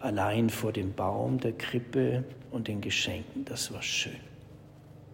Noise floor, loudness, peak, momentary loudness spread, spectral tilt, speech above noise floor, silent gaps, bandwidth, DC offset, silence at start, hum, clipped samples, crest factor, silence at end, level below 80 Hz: -51 dBFS; -31 LUFS; -16 dBFS; 10 LU; -4.5 dB/octave; 20 dB; none; 16 kHz; under 0.1%; 0 s; none; under 0.1%; 16 dB; 0 s; -60 dBFS